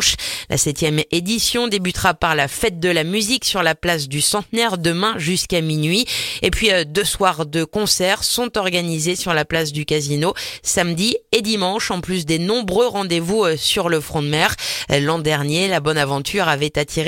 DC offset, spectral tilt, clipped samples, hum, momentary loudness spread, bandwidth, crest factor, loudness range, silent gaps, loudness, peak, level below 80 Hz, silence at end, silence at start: under 0.1%; -3.5 dB/octave; under 0.1%; none; 4 LU; 17 kHz; 18 dB; 1 LU; none; -18 LUFS; 0 dBFS; -40 dBFS; 0 s; 0 s